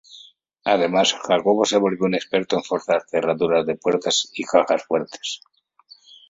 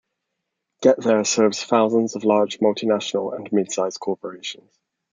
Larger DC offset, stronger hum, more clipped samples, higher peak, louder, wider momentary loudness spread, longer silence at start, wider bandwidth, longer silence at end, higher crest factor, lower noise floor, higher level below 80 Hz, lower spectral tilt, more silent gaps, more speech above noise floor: neither; neither; neither; about the same, -2 dBFS vs -4 dBFS; about the same, -21 LUFS vs -20 LUFS; second, 7 LU vs 11 LU; second, 0.15 s vs 0.8 s; second, 8 kHz vs 9.6 kHz; first, 0.95 s vs 0.6 s; about the same, 18 dB vs 18 dB; second, -52 dBFS vs -79 dBFS; first, -64 dBFS vs -72 dBFS; about the same, -3.5 dB/octave vs -4 dB/octave; neither; second, 32 dB vs 59 dB